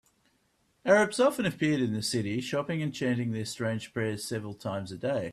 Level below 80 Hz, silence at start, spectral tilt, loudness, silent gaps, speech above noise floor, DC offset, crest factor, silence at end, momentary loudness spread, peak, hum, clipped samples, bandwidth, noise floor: -66 dBFS; 0.85 s; -5 dB/octave; -29 LUFS; none; 42 dB; under 0.1%; 20 dB; 0 s; 11 LU; -10 dBFS; none; under 0.1%; 14 kHz; -71 dBFS